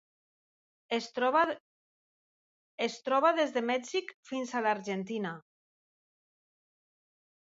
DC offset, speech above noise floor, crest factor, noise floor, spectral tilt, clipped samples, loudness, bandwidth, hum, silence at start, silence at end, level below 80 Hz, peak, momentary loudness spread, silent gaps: under 0.1%; over 59 dB; 20 dB; under -90 dBFS; -4 dB/octave; under 0.1%; -31 LUFS; 8 kHz; none; 0.9 s; 2 s; -84 dBFS; -14 dBFS; 12 LU; 1.60-2.78 s, 4.14-4.23 s